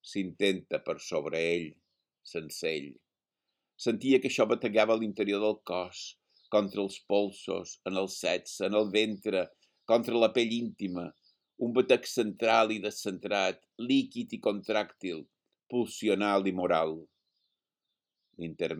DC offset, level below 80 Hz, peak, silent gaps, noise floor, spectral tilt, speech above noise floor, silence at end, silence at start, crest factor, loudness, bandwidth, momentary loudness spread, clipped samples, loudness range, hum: under 0.1%; -76 dBFS; -8 dBFS; none; -88 dBFS; -4.5 dB/octave; 58 dB; 0 s; 0.05 s; 22 dB; -30 LUFS; 18 kHz; 13 LU; under 0.1%; 4 LU; none